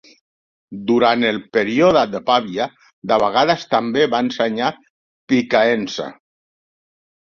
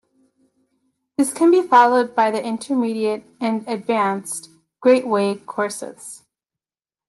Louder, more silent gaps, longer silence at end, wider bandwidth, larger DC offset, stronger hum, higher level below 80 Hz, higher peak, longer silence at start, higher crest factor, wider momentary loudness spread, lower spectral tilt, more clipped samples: about the same, -18 LUFS vs -19 LUFS; first, 2.93-3.02 s, 4.90-5.28 s vs none; first, 1.1 s vs 0.9 s; second, 7.2 kHz vs 12.5 kHz; neither; neither; first, -58 dBFS vs -74 dBFS; about the same, -2 dBFS vs -4 dBFS; second, 0.7 s vs 1.2 s; about the same, 18 dB vs 16 dB; second, 12 LU vs 17 LU; about the same, -5 dB/octave vs -4.5 dB/octave; neither